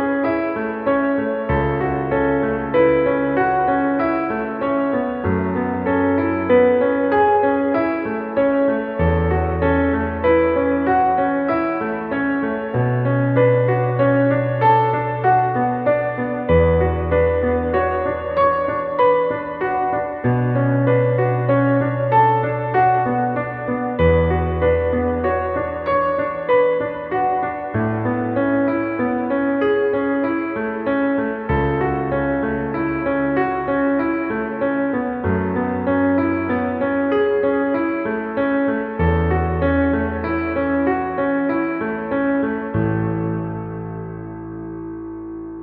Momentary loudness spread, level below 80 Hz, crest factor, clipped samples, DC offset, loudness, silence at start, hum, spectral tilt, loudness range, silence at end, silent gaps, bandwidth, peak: 6 LU; -36 dBFS; 14 dB; under 0.1%; under 0.1%; -19 LUFS; 0 s; none; -11.5 dB/octave; 3 LU; 0 s; none; 5 kHz; -4 dBFS